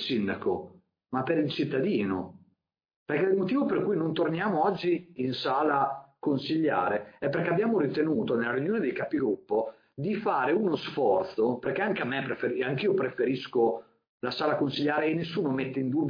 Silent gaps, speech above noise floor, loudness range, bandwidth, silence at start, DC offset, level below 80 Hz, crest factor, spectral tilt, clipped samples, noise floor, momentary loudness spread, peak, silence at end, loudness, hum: 2.96-3.06 s, 14.09-14.20 s; 46 dB; 1 LU; 5.2 kHz; 0 s; under 0.1%; -70 dBFS; 16 dB; -8 dB/octave; under 0.1%; -73 dBFS; 6 LU; -12 dBFS; 0 s; -28 LUFS; none